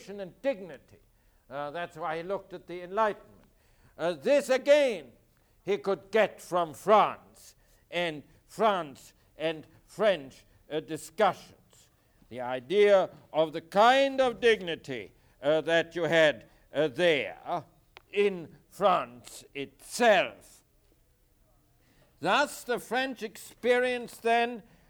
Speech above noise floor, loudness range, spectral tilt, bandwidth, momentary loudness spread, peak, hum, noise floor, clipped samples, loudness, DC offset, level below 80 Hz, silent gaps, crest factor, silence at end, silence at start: 38 dB; 7 LU; -4 dB/octave; 19.5 kHz; 18 LU; -10 dBFS; none; -66 dBFS; under 0.1%; -28 LUFS; under 0.1%; -66 dBFS; none; 20 dB; 0.3 s; 0.1 s